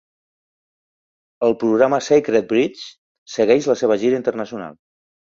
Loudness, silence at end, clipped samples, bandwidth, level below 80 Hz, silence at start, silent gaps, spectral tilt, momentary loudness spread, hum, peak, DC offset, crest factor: -18 LUFS; 0.5 s; under 0.1%; 7.6 kHz; -62 dBFS; 1.4 s; 2.98-3.26 s; -5 dB/octave; 15 LU; none; -2 dBFS; under 0.1%; 18 dB